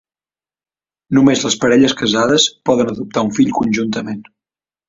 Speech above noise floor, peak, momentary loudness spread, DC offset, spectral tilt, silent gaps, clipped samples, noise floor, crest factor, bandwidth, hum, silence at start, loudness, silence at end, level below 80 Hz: over 76 dB; 0 dBFS; 8 LU; under 0.1%; -4 dB/octave; none; under 0.1%; under -90 dBFS; 16 dB; 7.8 kHz; none; 1.1 s; -14 LUFS; 0.65 s; -52 dBFS